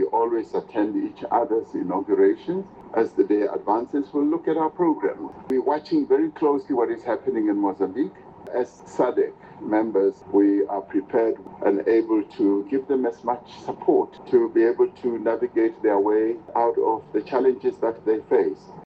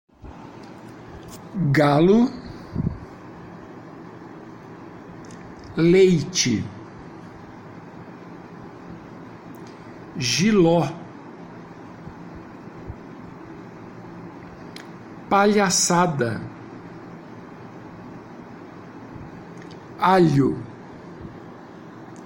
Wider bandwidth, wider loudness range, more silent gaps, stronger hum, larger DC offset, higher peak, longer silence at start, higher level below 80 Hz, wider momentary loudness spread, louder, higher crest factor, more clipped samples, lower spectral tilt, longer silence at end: second, 7.4 kHz vs 16.5 kHz; second, 2 LU vs 17 LU; neither; neither; neither; about the same, -6 dBFS vs -6 dBFS; second, 0 s vs 0.25 s; second, -66 dBFS vs -50 dBFS; second, 8 LU vs 24 LU; second, -23 LUFS vs -20 LUFS; about the same, 16 dB vs 20 dB; neither; first, -8 dB/octave vs -5 dB/octave; about the same, 0 s vs 0 s